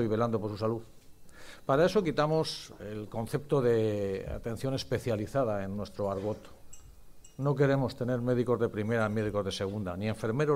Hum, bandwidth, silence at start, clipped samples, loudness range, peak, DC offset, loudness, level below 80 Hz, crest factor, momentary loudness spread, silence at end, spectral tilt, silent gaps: none; 16 kHz; 0 s; under 0.1%; 4 LU; -14 dBFS; under 0.1%; -31 LUFS; -54 dBFS; 18 dB; 11 LU; 0 s; -6.5 dB/octave; none